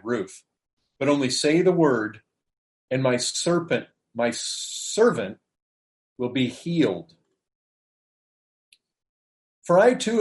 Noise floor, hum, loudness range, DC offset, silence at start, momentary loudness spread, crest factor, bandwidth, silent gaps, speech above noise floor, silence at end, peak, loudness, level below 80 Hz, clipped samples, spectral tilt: under -90 dBFS; none; 7 LU; under 0.1%; 0.05 s; 13 LU; 20 dB; 11.5 kHz; 0.73-0.77 s, 2.58-2.88 s, 5.62-6.16 s, 7.55-8.72 s, 9.09-9.62 s; over 68 dB; 0 s; -6 dBFS; -23 LUFS; -70 dBFS; under 0.1%; -4.5 dB/octave